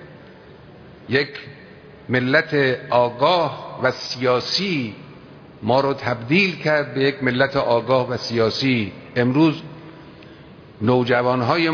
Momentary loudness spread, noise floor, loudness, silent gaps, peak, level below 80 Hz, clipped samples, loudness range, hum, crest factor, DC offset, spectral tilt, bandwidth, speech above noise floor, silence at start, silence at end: 9 LU; -43 dBFS; -20 LUFS; none; -2 dBFS; -58 dBFS; under 0.1%; 2 LU; none; 18 dB; under 0.1%; -6 dB/octave; 5.4 kHz; 24 dB; 0 s; 0 s